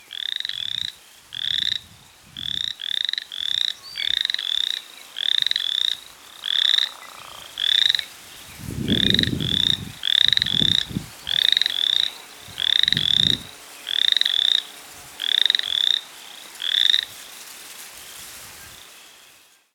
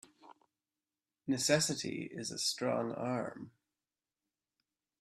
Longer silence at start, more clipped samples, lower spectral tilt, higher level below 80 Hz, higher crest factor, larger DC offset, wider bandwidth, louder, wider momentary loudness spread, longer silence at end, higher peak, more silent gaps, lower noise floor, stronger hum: second, 0.1 s vs 0.25 s; neither; second, -2 dB/octave vs -3.5 dB/octave; first, -50 dBFS vs -76 dBFS; about the same, 24 dB vs 24 dB; neither; first, 19.5 kHz vs 14.5 kHz; first, -20 LUFS vs -35 LUFS; first, 21 LU vs 16 LU; second, 0.7 s vs 1.5 s; first, 0 dBFS vs -14 dBFS; neither; second, -53 dBFS vs under -90 dBFS; neither